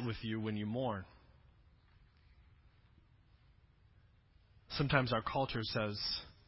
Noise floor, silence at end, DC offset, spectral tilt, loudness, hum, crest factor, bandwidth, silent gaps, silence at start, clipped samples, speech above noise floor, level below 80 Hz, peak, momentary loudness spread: -67 dBFS; 0.15 s; under 0.1%; -8.5 dB/octave; -37 LUFS; none; 28 dB; 5.8 kHz; none; 0 s; under 0.1%; 30 dB; -60 dBFS; -14 dBFS; 9 LU